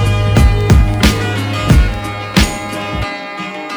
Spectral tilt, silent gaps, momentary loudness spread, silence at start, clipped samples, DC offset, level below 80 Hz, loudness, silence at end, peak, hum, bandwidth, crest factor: -5.5 dB/octave; none; 11 LU; 0 s; 0.1%; under 0.1%; -16 dBFS; -14 LUFS; 0 s; 0 dBFS; none; over 20 kHz; 12 dB